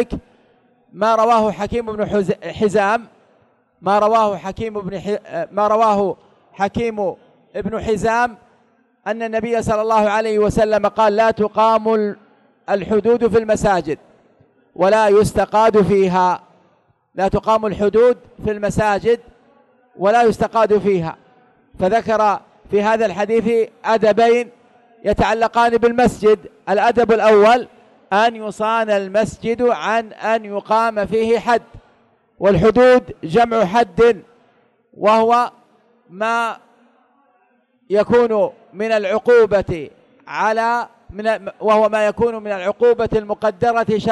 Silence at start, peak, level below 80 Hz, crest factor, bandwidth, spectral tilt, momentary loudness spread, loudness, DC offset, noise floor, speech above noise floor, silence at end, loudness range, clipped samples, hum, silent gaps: 0 s; -4 dBFS; -44 dBFS; 12 dB; 12 kHz; -6 dB/octave; 11 LU; -17 LUFS; under 0.1%; -60 dBFS; 44 dB; 0 s; 4 LU; under 0.1%; none; none